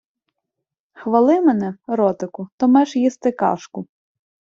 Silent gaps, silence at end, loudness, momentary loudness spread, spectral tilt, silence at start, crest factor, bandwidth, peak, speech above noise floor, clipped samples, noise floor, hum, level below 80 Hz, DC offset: 2.52-2.58 s; 0.55 s; -18 LUFS; 15 LU; -7 dB/octave; 1 s; 18 dB; 7.6 kHz; -2 dBFS; 64 dB; under 0.1%; -82 dBFS; none; -66 dBFS; under 0.1%